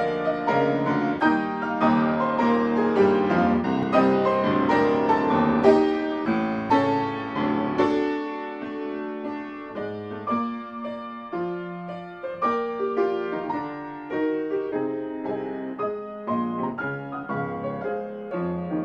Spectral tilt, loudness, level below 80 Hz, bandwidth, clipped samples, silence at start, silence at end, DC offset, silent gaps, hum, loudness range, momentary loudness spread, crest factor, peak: -8 dB/octave; -25 LUFS; -58 dBFS; 8 kHz; under 0.1%; 0 s; 0 s; under 0.1%; none; none; 9 LU; 12 LU; 20 dB; -4 dBFS